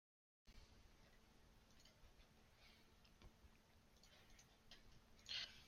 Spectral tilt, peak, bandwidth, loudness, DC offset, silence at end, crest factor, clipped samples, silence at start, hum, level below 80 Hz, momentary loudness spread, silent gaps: -2 dB/octave; -36 dBFS; 16 kHz; -56 LUFS; under 0.1%; 0 s; 28 dB; under 0.1%; 0.45 s; none; -74 dBFS; 19 LU; none